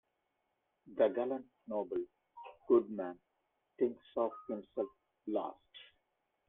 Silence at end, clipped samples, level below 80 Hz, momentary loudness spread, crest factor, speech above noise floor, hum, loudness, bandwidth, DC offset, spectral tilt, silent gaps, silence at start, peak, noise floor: 0.65 s; under 0.1%; -80 dBFS; 23 LU; 22 dB; 47 dB; none; -37 LUFS; 3.8 kHz; under 0.1%; -9 dB/octave; none; 0.85 s; -16 dBFS; -83 dBFS